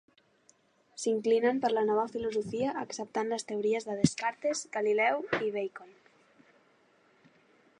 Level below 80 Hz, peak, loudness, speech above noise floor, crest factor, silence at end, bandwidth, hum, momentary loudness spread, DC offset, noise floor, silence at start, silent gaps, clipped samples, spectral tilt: -68 dBFS; -8 dBFS; -31 LUFS; 36 dB; 24 dB; 1.9 s; 11 kHz; none; 9 LU; under 0.1%; -67 dBFS; 0.95 s; none; under 0.1%; -4.5 dB/octave